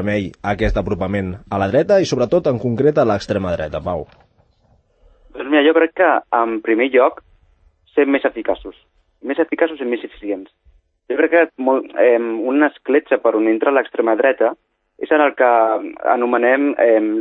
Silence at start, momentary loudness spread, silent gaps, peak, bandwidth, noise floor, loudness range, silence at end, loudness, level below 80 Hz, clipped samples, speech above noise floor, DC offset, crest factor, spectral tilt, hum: 0 s; 10 LU; none; -2 dBFS; 8.4 kHz; -57 dBFS; 5 LU; 0 s; -17 LUFS; -40 dBFS; under 0.1%; 41 dB; under 0.1%; 16 dB; -6.5 dB/octave; none